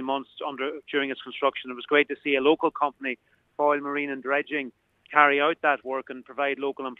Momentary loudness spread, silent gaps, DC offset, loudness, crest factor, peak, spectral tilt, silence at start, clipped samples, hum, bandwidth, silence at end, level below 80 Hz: 13 LU; none; under 0.1%; -26 LUFS; 24 dB; -2 dBFS; -6 dB/octave; 0 s; under 0.1%; none; 4.1 kHz; 0.05 s; -74 dBFS